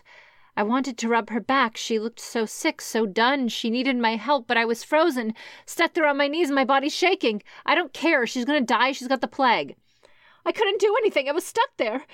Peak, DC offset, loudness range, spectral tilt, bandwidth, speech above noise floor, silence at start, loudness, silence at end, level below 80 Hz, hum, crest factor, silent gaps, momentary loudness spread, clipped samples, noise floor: -6 dBFS; under 0.1%; 2 LU; -3 dB/octave; 16.5 kHz; 33 dB; 0.55 s; -23 LUFS; 0.1 s; -74 dBFS; none; 18 dB; none; 7 LU; under 0.1%; -56 dBFS